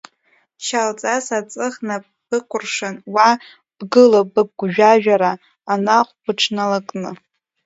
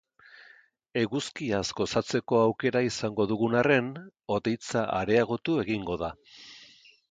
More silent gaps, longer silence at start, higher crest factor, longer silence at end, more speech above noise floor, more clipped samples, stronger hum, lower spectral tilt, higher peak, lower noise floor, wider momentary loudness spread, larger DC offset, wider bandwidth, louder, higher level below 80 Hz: neither; second, 0.6 s vs 0.95 s; about the same, 18 dB vs 20 dB; about the same, 0.5 s vs 0.5 s; first, 44 dB vs 31 dB; neither; neither; second, -4 dB/octave vs -5.5 dB/octave; first, 0 dBFS vs -10 dBFS; about the same, -61 dBFS vs -58 dBFS; about the same, 15 LU vs 13 LU; neither; second, 8 kHz vs 9.4 kHz; first, -17 LUFS vs -28 LUFS; second, -70 dBFS vs -58 dBFS